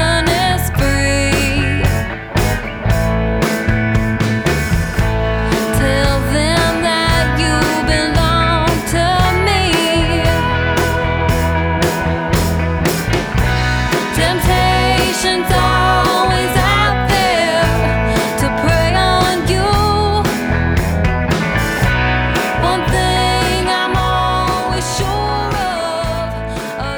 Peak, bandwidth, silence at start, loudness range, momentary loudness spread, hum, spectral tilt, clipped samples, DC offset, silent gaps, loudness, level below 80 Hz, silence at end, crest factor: 0 dBFS; over 20 kHz; 0 s; 3 LU; 4 LU; none; -5 dB/octave; under 0.1%; under 0.1%; none; -15 LUFS; -22 dBFS; 0 s; 14 dB